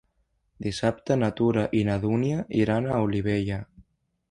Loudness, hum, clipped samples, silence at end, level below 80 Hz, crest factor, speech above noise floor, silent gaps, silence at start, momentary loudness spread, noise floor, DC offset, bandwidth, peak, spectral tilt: -26 LUFS; none; under 0.1%; 0.5 s; -50 dBFS; 18 dB; 47 dB; none; 0.6 s; 8 LU; -71 dBFS; under 0.1%; 11 kHz; -8 dBFS; -7.5 dB/octave